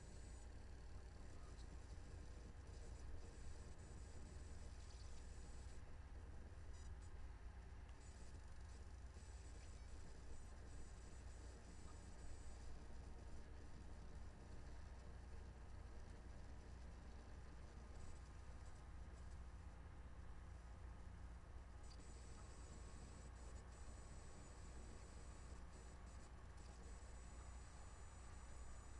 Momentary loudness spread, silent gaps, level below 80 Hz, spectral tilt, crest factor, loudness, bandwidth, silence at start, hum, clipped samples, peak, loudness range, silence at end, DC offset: 2 LU; none; -58 dBFS; -5 dB/octave; 12 dB; -60 LUFS; 11 kHz; 0 s; none; under 0.1%; -42 dBFS; 1 LU; 0 s; under 0.1%